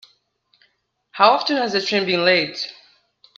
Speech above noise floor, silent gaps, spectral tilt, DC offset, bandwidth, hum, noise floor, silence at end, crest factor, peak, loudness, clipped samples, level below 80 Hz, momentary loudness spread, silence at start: 47 dB; none; -4 dB/octave; under 0.1%; 7.8 kHz; none; -65 dBFS; 0.65 s; 22 dB; 0 dBFS; -18 LUFS; under 0.1%; -70 dBFS; 14 LU; 1.15 s